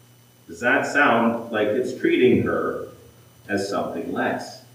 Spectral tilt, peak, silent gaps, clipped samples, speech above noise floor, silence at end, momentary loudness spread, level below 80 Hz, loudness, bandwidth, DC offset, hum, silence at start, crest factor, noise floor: -5.5 dB/octave; -6 dBFS; none; under 0.1%; 28 dB; 0.15 s; 11 LU; -64 dBFS; -22 LUFS; 16 kHz; under 0.1%; none; 0.5 s; 18 dB; -49 dBFS